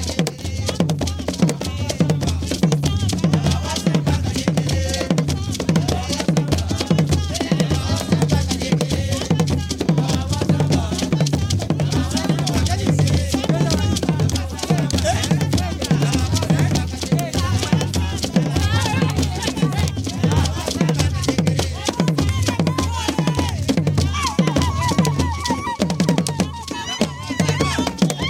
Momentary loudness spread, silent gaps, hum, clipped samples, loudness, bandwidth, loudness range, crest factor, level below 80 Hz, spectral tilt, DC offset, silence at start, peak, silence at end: 4 LU; none; none; under 0.1%; -20 LUFS; 16.5 kHz; 1 LU; 18 dB; -32 dBFS; -5.5 dB/octave; under 0.1%; 0 s; 0 dBFS; 0 s